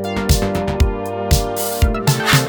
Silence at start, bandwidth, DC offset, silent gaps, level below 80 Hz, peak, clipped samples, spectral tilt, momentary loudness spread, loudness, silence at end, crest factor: 0 s; over 20 kHz; under 0.1%; none; -22 dBFS; 0 dBFS; under 0.1%; -4.5 dB/octave; 4 LU; -18 LUFS; 0 s; 16 dB